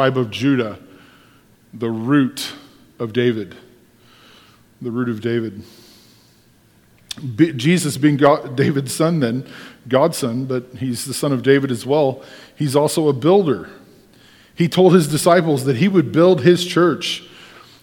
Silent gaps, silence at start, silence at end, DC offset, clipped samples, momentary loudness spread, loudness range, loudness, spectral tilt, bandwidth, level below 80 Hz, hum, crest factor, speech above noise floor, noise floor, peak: none; 0 s; 0.35 s; under 0.1%; under 0.1%; 14 LU; 10 LU; -17 LUFS; -6 dB/octave; 18.5 kHz; -60 dBFS; none; 18 dB; 36 dB; -53 dBFS; 0 dBFS